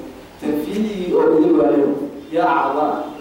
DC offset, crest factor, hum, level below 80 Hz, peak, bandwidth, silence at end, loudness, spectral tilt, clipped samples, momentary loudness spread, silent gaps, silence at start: under 0.1%; 12 dB; none; -52 dBFS; -6 dBFS; 16.5 kHz; 0 s; -18 LUFS; -7 dB/octave; under 0.1%; 10 LU; none; 0 s